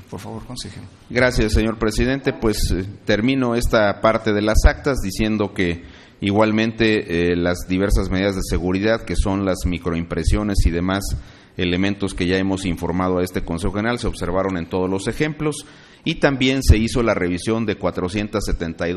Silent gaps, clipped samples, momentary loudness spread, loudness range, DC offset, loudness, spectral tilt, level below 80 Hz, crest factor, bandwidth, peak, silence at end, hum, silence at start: none; under 0.1%; 8 LU; 3 LU; under 0.1%; -20 LUFS; -5.5 dB/octave; -26 dBFS; 20 dB; 13 kHz; 0 dBFS; 0 s; none; 0 s